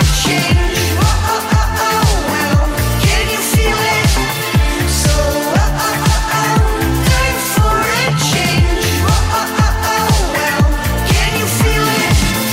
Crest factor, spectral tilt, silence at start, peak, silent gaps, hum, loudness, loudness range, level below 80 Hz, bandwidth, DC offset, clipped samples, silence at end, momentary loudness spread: 10 dB; -4 dB/octave; 0 s; -2 dBFS; none; none; -13 LUFS; 0 LU; -18 dBFS; 16.5 kHz; under 0.1%; under 0.1%; 0 s; 2 LU